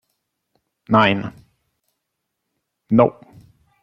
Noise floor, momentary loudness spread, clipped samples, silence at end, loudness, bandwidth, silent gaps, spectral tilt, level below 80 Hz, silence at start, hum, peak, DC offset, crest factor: -78 dBFS; 9 LU; under 0.1%; 0.7 s; -17 LUFS; 6.4 kHz; none; -8 dB/octave; -54 dBFS; 0.9 s; none; -2 dBFS; under 0.1%; 20 dB